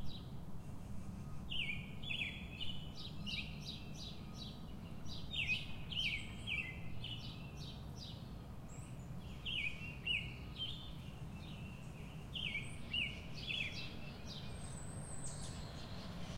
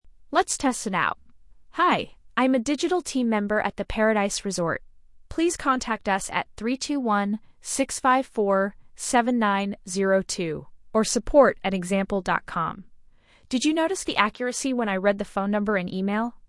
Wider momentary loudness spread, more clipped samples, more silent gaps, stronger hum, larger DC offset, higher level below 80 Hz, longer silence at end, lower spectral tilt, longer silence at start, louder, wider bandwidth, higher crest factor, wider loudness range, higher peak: first, 11 LU vs 7 LU; neither; neither; neither; neither; second, -56 dBFS vs -48 dBFS; about the same, 0 s vs 0.1 s; about the same, -3.5 dB/octave vs -4 dB/octave; about the same, 0 s vs 0.05 s; second, -44 LUFS vs -24 LUFS; first, 16 kHz vs 12 kHz; about the same, 18 dB vs 22 dB; about the same, 4 LU vs 3 LU; second, -28 dBFS vs -2 dBFS